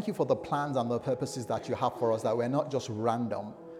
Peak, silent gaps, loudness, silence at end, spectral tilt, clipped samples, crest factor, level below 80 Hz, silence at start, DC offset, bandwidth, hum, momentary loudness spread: -14 dBFS; none; -31 LUFS; 0 s; -6.5 dB/octave; under 0.1%; 18 dB; -70 dBFS; 0 s; under 0.1%; 15 kHz; none; 5 LU